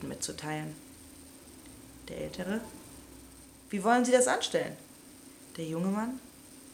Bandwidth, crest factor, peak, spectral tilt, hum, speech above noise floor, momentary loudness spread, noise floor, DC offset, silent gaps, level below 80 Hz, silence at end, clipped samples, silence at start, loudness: 17 kHz; 24 dB; -10 dBFS; -4 dB/octave; none; 22 dB; 25 LU; -53 dBFS; under 0.1%; none; -62 dBFS; 0 s; under 0.1%; 0 s; -31 LUFS